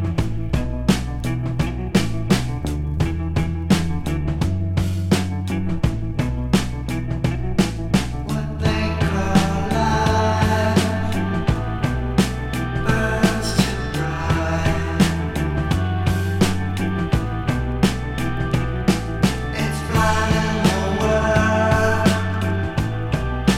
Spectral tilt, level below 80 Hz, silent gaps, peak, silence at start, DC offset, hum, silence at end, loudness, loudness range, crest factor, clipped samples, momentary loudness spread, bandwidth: -6 dB/octave; -30 dBFS; none; -2 dBFS; 0 s; under 0.1%; none; 0 s; -21 LUFS; 3 LU; 18 dB; under 0.1%; 6 LU; 16 kHz